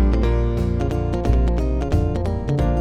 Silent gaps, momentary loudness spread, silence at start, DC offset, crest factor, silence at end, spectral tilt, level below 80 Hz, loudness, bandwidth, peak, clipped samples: none; 3 LU; 0 s; under 0.1%; 14 dB; 0 s; -8.5 dB/octave; -22 dBFS; -21 LUFS; 7.4 kHz; -4 dBFS; under 0.1%